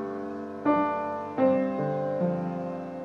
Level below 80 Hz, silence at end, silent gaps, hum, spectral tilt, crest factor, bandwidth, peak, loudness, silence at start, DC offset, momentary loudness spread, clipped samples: -70 dBFS; 0 s; none; none; -9.5 dB/octave; 16 dB; 6.6 kHz; -12 dBFS; -28 LUFS; 0 s; under 0.1%; 10 LU; under 0.1%